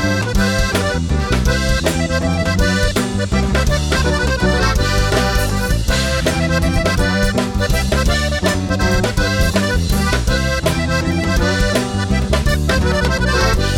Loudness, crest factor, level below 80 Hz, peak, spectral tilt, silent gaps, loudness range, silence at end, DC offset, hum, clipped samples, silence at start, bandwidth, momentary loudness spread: -16 LUFS; 12 dB; -20 dBFS; -4 dBFS; -5 dB/octave; none; 1 LU; 0 s; under 0.1%; none; under 0.1%; 0 s; 18 kHz; 2 LU